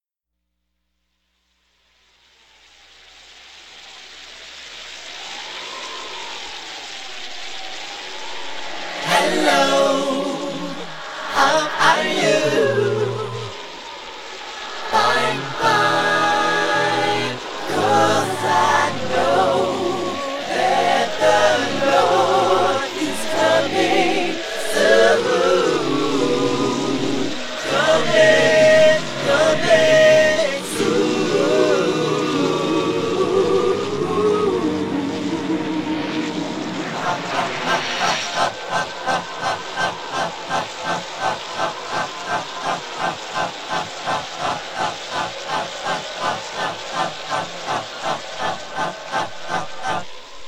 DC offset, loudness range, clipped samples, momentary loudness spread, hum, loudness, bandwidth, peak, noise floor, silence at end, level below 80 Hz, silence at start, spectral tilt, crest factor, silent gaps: under 0.1%; 10 LU; under 0.1%; 14 LU; none; -19 LUFS; 16 kHz; -2 dBFS; -79 dBFS; 0 s; -58 dBFS; 3.3 s; -3.5 dB/octave; 18 dB; none